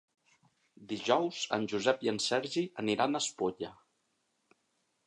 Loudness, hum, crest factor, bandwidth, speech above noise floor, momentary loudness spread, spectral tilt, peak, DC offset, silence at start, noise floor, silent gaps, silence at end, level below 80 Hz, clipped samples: -32 LUFS; none; 22 dB; 11.5 kHz; 46 dB; 7 LU; -3.5 dB/octave; -12 dBFS; under 0.1%; 0.8 s; -78 dBFS; none; 1.35 s; -76 dBFS; under 0.1%